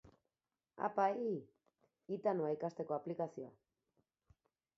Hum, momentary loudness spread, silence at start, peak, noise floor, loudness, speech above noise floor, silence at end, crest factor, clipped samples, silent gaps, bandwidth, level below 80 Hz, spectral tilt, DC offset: none; 11 LU; 0.05 s; -22 dBFS; under -90 dBFS; -40 LUFS; over 51 dB; 1.25 s; 20 dB; under 0.1%; none; 7.4 kHz; -82 dBFS; -7 dB/octave; under 0.1%